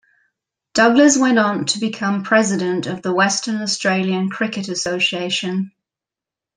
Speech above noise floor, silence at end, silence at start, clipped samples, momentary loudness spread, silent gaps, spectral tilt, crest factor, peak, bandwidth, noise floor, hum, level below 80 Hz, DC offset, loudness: 70 dB; 0.9 s; 0.75 s; under 0.1%; 10 LU; none; -3.5 dB/octave; 18 dB; -2 dBFS; 10 kHz; -87 dBFS; none; -62 dBFS; under 0.1%; -18 LUFS